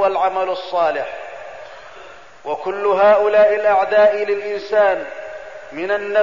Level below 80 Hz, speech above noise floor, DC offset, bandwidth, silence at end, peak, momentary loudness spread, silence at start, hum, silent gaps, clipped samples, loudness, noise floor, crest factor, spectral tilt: -58 dBFS; 24 dB; 0.6%; 7.4 kHz; 0 s; -4 dBFS; 21 LU; 0 s; none; none; under 0.1%; -17 LUFS; -40 dBFS; 14 dB; -4.5 dB/octave